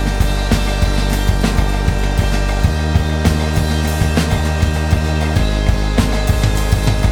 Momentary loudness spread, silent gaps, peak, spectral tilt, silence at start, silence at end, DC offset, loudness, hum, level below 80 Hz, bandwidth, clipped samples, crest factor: 2 LU; none; -2 dBFS; -5.5 dB/octave; 0 s; 0 s; under 0.1%; -16 LUFS; none; -18 dBFS; 18 kHz; under 0.1%; 14 dB